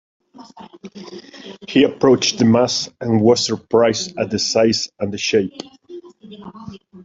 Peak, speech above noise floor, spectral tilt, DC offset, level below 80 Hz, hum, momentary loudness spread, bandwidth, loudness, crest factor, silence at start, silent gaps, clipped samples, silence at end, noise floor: 0 dBFS; 21 dB; -4.5 dB/octave; under 0.1%; -58 dBFS; none; 23 LU; 7.8 kHz; -17 LUFS; 18 dB; 0.4 s; none; under 0.1%; 0 s; -39 dBFS